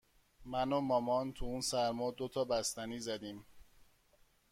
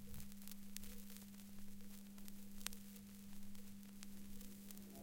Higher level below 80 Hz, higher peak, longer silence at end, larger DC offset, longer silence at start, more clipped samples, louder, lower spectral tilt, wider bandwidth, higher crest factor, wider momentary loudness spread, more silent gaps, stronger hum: about the same, -58 dBFS vs -62 dBFS; second, -20 dBFS vs -16 dBFS; first, 0.9 s vs 0 s; neither; first, 0.4 s vs 0 s; neither; first, -37 LUFS vs -56 LUFS; about the same, -4 dB/octave vs -3.5 dB/octave; about the same, 16.5 kHz vs 17 kHz; second, 18 dB vs 34 dB; about the same, 9 LU vs 7 LU; neither; neither